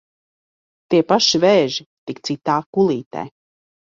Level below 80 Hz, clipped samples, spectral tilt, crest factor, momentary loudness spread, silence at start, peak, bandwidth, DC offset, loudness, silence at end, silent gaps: -62 dBFS; under 0.1%; -4.5 dB/octave; 18 dB; 17 LU; 0.9 s; -2 dBFS; 7.6 kHz; under 0.1%; -17 LUFS; 0.7 s; 1.86-2.07 s, 2.66-2.73 s, 3.06-3.11 s